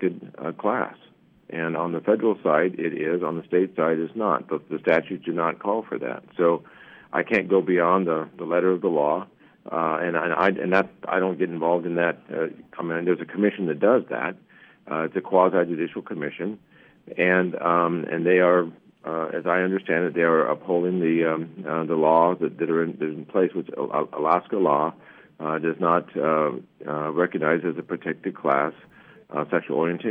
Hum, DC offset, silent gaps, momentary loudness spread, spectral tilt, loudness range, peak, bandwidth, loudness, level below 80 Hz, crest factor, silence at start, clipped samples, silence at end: none; under 0.1%; none; 10 LU; -9 dB/octave; 3 LU; -4 dBFS; 5.6 kHz; -24 LUFS; -74 dBFS; 20 dB; 0 s; under 0.1%; 0 s